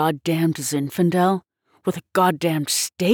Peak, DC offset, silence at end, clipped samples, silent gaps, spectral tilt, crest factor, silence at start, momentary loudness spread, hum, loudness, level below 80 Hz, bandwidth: -6 dBFS; under 0.1%; 0 s; under 0.1%; none; -4.5 dB/octave; 14 dB; 0 s; 9 LU; none; -21 LUFS; -66 dBFS; over 20 kHz